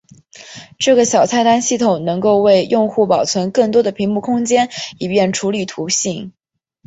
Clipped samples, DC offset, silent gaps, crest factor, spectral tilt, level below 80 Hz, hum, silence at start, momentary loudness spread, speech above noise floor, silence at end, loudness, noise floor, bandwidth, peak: under 0.1%; under 0.1%; none; 14 dB; -4 dB/octave; -56 dBFS; none; 0.35 s; 10 LU; 26 dB; 0.55 s; -15 LUFS; -41 dBFS; 8.2 kHz; -2 dBFS